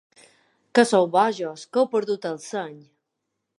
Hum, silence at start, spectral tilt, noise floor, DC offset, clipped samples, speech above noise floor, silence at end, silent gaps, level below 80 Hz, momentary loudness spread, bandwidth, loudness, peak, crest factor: none; 0.75 s; -4.5 dB/octave; -80 dBFS; under 0.1%; under 0.1%; 58 dB; 0.8 s; none; -82 dBFS; 13 LU; 11.5 kHz; -23 LUFS; -2 dBFS; 22 dB